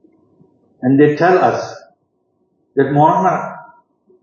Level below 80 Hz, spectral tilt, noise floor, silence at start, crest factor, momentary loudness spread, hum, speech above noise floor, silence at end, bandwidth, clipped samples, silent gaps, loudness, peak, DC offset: -64 dBFS; -7.5 dB/octave; -64 dBFS; 0.8 s; 16 dB; 16 LU; none; 52 dB; 0.6 s; 7 kHz; under 0.1%; none; -14 LUFS; 0 dBFS; under 0.1%